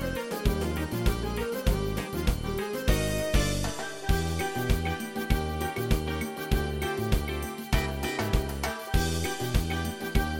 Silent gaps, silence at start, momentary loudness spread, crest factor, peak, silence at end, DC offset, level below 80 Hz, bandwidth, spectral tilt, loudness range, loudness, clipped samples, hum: none; 0 s; 4 LU; 18 dB; -10 dBFS; 0 s; under 0.1%; -32 dBFS; 17 kHz; -5 dB/octave; 1 LU; -30 LUFS; under 0.1%; none